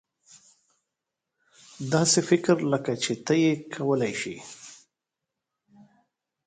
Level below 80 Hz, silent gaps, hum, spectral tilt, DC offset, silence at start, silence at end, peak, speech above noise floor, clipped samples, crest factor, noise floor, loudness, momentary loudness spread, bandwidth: -70 dBFS; none; none; -4.5 dB/octave; under 0.1%; 1.8 s; 1.7 s; -8 dBFS; 61 dB; under 0.1%; 20 dB; -86 dBFS; -25 LUFS; 19 LU; 9.6 kHz